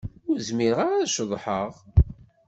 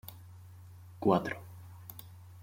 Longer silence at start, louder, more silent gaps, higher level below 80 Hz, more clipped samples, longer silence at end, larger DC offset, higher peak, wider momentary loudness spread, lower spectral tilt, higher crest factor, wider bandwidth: about the same, 0.05 s vs 0.05 s; first, -25 LUFS vs -32 LUFS; neither; first, -32 dBFS vs -68 dBFS; neither; first, 0.35 s vs 0 s; neither; first, -4 dBFS vs -12 dBFS; second, 6 LU vs 24 LU; second, -5.5 dB/octave vs -7 dB/octave; about the same, 20 dB vs 24 dB; second, 8.2 kHz vs 16.5 kHz